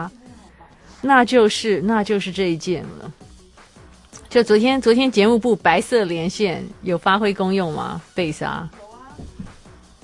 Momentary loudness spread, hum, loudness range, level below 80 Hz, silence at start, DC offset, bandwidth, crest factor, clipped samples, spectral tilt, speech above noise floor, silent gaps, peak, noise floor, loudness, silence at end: 21 LU; none; 5 LU; -50 dBFS; 0 s; under 0.1%; 11.5 kHz; 20 dB; under 0.1%; -5 dB/octave; 28 dB; none; 0 dBFS; -47 dBFS; -18 LUFS; 0.5 s